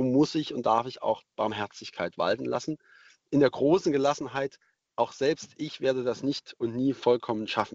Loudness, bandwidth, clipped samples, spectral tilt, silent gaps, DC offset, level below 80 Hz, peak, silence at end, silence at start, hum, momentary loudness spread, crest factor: -28 LUFS; 8 kHz; under 0.1%; -5.5 dB/octave; none; under 0.1%; -66 dBFS; -10 dBFS; 0 s; 0 s; none; 11 LU; 18 dB